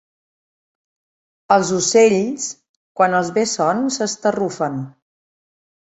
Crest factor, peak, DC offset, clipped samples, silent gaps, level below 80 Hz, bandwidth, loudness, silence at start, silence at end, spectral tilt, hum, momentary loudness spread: 20 dB; 0 dBFS; under 0.1%; under 0.1%; 2.69-2.95 s; -62 dBFS; 8.4 kHz; -18 LUFS; 1.5 s; 1.05 s; -4 dB/octave; none; 13 LU